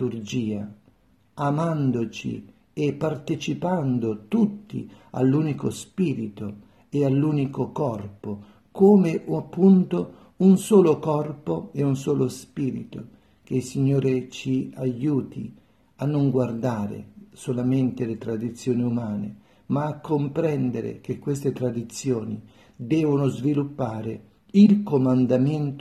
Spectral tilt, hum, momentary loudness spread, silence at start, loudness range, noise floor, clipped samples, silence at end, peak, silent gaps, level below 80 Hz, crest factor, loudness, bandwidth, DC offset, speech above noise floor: -8 dB/octave; none; 17 LU; 0 s; 6 LU; -60 dBFS; under 0.1%; 0 s; -6 dBFS; none; -62 dBFS; 18 dB; -24 LUFS; 13 kHz; under 0.1%; 37 dB